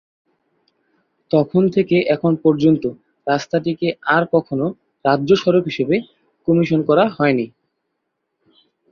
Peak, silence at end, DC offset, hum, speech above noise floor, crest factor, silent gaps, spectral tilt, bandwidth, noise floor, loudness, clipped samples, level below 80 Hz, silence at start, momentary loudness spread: -2 dBFS; 1.45 s; under 0.1%; none; 58 dB; 16 dB; none; -7.5 dB/octave; 7 kHz; -74 dBFS; -18 LUFS; under 0.1%; -58 dBFS; 1.35 s; 8 LU